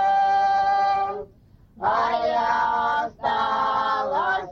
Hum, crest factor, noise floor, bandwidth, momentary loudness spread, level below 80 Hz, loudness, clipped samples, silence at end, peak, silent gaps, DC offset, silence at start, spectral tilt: none; 12 dB; -52 dBFS; 7 kHz; 6 LU; -56 dBFS; -22 LUFS; under 0.1%; 0 s; -10 dBFS; none; under 0.1%; 0 s; -4 dB/octave